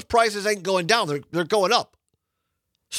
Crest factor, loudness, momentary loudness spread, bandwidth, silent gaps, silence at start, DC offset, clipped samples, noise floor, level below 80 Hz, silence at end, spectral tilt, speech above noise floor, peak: 22 dB; -22 LUFS; 6 LU; 16 kHz; none; 0.1 s; under 0.1%; under 0.1%; -79 dBFS; -56 dBFS; 0 s; -3 dB/octave; 57 dB; 0 dBFS